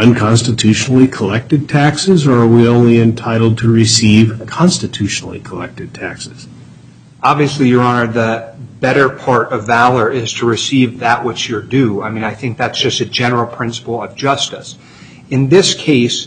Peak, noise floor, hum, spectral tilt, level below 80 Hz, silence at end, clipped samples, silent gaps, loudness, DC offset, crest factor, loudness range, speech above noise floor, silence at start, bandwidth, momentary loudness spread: 0 dBFS; -39 dBFS; none; -5 dB/octave; -46 dBFS; 0 s; under 0.1%; none; -12 LUFS; under 0.1%; 12 dB; 6 LU; 27 dB; 0 s; 9.4 kHz; 13 LU